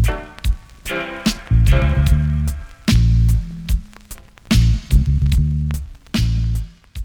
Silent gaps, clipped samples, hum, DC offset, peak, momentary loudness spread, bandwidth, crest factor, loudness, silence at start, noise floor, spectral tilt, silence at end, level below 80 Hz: none; under 0.1%; none; under 0.1%; -4 dBFS; 12 LU; 18.5 kHz; 14 dB; -19 LUFS; 0 s; -38 dBFS; -6 dB/octave; 0 s; -20 dBFS